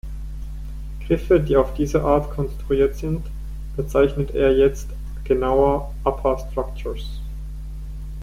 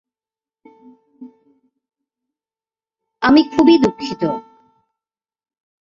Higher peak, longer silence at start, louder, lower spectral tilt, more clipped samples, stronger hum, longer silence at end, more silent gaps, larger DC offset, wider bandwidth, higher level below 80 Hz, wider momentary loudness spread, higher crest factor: about the same, -2 dBFS vs -2 dBFS; second, 0.05 s vs 1.2 s; second, -21 LUFS vs -15 LUFS; first, -7.5 dB/octave vs -6 dB/octave; neither; neither; second, 0 s vs 1.55 s; neither; neither; first, 15.5 kHz vs 7.6 kHz; first, -30 dBFS vs -54 dBFS; first, 17 LU vs 11 LU; about the same, 18 dB vs 20 dB